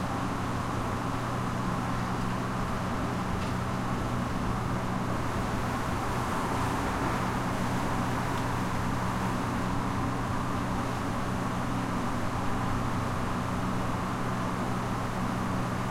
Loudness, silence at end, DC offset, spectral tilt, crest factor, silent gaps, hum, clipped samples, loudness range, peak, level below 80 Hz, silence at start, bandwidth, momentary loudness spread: -31 LUFS; 0 s; under 0.1%; -6 dB/octave; 14 dB; none; none; under 0.1%; 1 LU; -16 dBFS; -42 dBFS; 0 s; 16 kHz; 2 LU